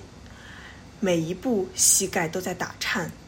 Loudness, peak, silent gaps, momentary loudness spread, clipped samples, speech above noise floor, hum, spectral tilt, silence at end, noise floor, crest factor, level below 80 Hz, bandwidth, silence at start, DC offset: -23 LUFS; -6 dBFS; none; 25 LU; under 0.1%; 19 dB; none; -2.5 dB/octave; 0 s; -44 dBFS; 22 dB; -52 dBFS; 16.5 kHz; 0 s; under 0.1%